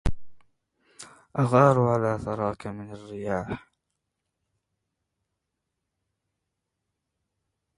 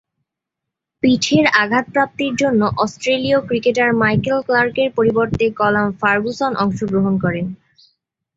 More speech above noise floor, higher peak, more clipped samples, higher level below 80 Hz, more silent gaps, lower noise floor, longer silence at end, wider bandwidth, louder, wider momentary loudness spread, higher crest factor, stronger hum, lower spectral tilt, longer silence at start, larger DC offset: second, 58 dB vs 65 dB; second, -4 dBFS vs 0 dBFS; neither; about the same, -44 dBFS vs -48 dBFS; neither; about the same, -82 dBFS vs -82 dBFS; first, 4.2 s vs 0.8 s; first, 11.5 kHz vs 8 kHz; second, -25 LUFS vs -17 LUFS; first, 20 LU vs 5 LU; first, 26 dB vs 16 dB; neither; first, -8 dB/octave vs -5.5 dB/octave; second, 0.05 s vs 1.05 s; neither